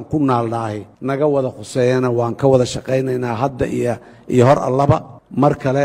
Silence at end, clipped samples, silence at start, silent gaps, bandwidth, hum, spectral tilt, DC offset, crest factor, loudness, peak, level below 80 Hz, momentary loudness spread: 0 s; under 0.1%; 0 s; none; 12 kHz; none; -7 dB/octave; under 0.1%; 16 dB; -17 LUFS; 0 dBFS; -44 dBFS; 9 LU